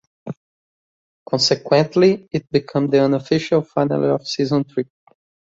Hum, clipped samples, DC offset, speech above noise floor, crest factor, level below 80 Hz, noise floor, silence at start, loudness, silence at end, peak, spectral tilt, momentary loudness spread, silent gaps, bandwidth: none; under 0.1%; under 0.1%; over 72 dB; 18 dB; -60 dBFS; under -90 dBFS; 0.25 s; -18 LUFS; 0.75 s; -2 dBFS; -5.5 dB/octave; 16 LU; 0.37-1.26 s; 8 kHz